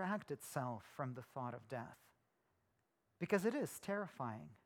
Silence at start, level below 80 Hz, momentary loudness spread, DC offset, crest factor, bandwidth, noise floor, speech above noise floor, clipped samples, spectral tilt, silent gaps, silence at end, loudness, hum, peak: 0 s; -84 dBFS; 11 LU; under 0.1%; 24 dB; 19.5 kHz; -83 dBFS; 39 dB; under 0.1%; -6 dB/octave; none; 0.1 s; -44 LUFS; none; -22 dBFS